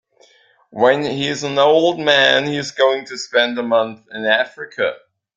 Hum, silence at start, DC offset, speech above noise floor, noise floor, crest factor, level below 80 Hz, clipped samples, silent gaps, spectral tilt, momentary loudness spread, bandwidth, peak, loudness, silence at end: none; 0.75 s; under 0.1%; 37 dB; -54 dBFS; 16 dB; -62 dBFS; under 0.1%; none; -3.5 dB/octave; 10 LU; 9 kHz; 0 dBFS; -17 LUFS; 0.4 s